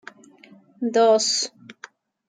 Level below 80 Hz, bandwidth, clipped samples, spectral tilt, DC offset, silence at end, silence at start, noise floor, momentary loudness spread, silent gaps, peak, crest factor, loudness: -84 dBFS; 9.6 kHz; under 0.1%; -1.5 dB/octave; under 0.1%; 0.55 s; 0.8 s; -51 dBFS; 24 LU; none; -6 dBFS; 18 dB; -20 LUFS